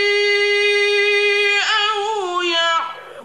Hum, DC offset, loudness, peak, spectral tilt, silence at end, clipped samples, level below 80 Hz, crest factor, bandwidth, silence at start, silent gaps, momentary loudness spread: none; 0.2%; -16 LUFS; -6 dBFS; 0 dB/octave; 0 s; under 0.1%; -70 dBFS; 12 dB; 12.5 kHz; 0 s; none; 7 LU